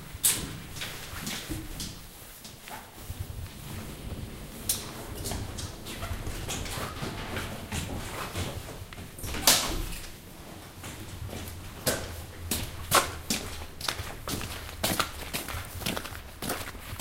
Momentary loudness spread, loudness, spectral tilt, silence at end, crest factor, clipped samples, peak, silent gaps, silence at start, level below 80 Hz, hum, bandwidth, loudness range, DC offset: 17 LU; -32 LUFS; -2.5 dB/octave; 0 s; 30 dB; under 0.1%; -4 dBFS; none; 0 s; -44 dBFS; none; 17 kHz; 8 LU; under 0.1%